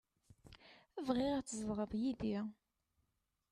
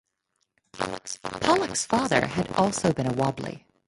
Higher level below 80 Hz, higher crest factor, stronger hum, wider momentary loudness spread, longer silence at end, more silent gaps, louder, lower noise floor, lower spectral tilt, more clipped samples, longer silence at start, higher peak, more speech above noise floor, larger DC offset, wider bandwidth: second, -66 dBFS vs -54 dBFS; about the same, 18 dB vs 20 dB; neither; first, 22 LU vs 11 LU; first, 1 s vs 0.3 s; neither; second, -40 LUFS vs -26 LUFS; first, -85 dBFS vs -76 dBFS; about the same, -5.5 dB/octave vs -4.5 dB/octave; neither; second, 0.45 s vs 0.75 s; second, -24 dBFS vs -6 dBFS; second, 46 dB vs 51 dB; neither; about the same, 12 kHz vs 11.5 kHz